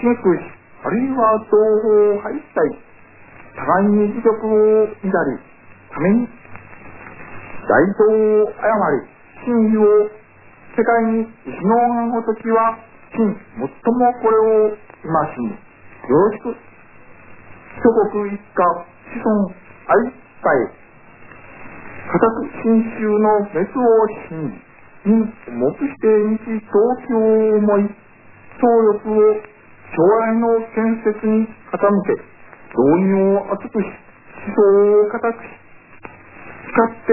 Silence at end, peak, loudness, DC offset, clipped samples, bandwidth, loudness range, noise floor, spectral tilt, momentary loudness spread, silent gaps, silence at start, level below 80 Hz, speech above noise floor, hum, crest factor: 0 s; -2 dBFS; -17 LUFS; under 0.1%; under 0.1%; 2.9 kHz; 4 LU; -45 dBFS; -13 dB/octave; 15 LU; none; 0 s; -56 dBFS; 29 dB; none; 16 dB